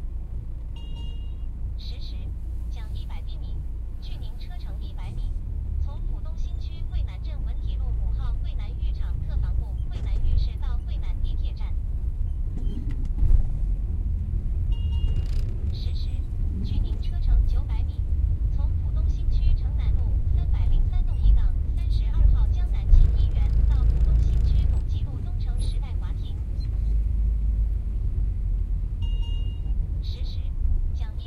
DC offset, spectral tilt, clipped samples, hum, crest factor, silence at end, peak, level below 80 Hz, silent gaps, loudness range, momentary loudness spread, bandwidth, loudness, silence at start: under 0.1%; -8 dB/octave; under 0.1%; none; 18 dB; 0 s; -4 dBFS; -24 dBFS; none; 11 LU; 12 LU; 5 kHz; -28 LUFS; 0 s